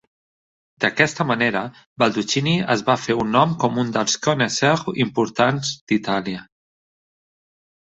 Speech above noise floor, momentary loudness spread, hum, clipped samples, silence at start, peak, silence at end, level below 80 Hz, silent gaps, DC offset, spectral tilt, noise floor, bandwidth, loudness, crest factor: over 70 dB; 6 LU; none; under 0.1%; 0.8 s; -2 dBFS; 1.5 s; -58 dBFS; 1.86-1.96 s, 5.81-5.87 s; under 0.1%; -4.5 dB/octave; under -90 dBFS; 8.2 kHz; -20 LUFS; 20 dB